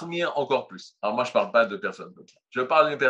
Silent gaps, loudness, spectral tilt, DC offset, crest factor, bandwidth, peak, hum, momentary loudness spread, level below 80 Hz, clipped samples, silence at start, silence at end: none; -25 LUFS; -5 dB/octave; under 0.1%; 20 dB; 8.2 kHz; -6 dBFS; none; 17 LU; -82 dBFS; under 0.1%; 0 s; 0 s